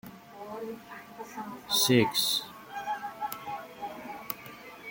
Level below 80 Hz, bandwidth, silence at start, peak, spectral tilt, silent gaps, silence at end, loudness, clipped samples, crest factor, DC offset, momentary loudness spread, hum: -70 dBFS; 17 kHz; 0.05 s; -10 dBFS; -3 dB/octave; none; 0 s; -30 LUFS; under 0.1%; 24 dB; under 0.1%; 21 LU; none